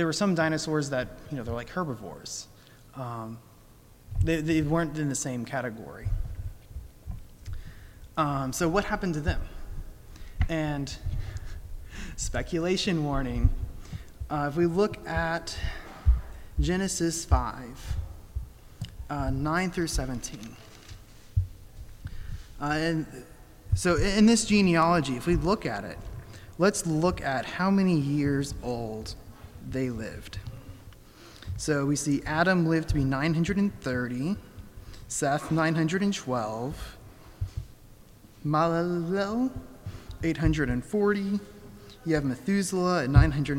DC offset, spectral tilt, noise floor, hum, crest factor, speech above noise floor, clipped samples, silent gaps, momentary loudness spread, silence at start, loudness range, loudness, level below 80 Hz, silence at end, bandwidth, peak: under 0.1%; -5.5 dB/octave; -53 dBFS; none; 22 dB; 27 dB; under 0.1%; none; 19 LU; 0 s; 9 LU; -28 LUFS; -38 dBFS; 0 s; 17 kHz; -6 dBFS